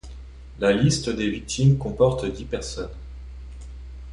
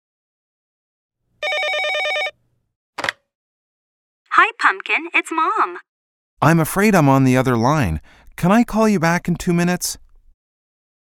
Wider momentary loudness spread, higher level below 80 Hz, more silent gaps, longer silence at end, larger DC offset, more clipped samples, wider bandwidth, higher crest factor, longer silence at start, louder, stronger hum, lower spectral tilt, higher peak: first, 21 LU vs 11 LU; first, -38 dBFS vs -44 dBFS; second, none vs 2.76-2.93 s, 3.35-4.25 s, 5.89-6.37 s; second, 0 s vs 1.2 s; neither; neither; second, 11 kHz vs 17.5 kHz; about the same, 18 dB vs 20 dB; second, 0.05 s vs 1.4 s; second, -23 LUFS vs -17 LUFS; neither; about the same, -6 dB/octave vs -5.5 dB/octave; second, -6 dBFS vs 0 dBFS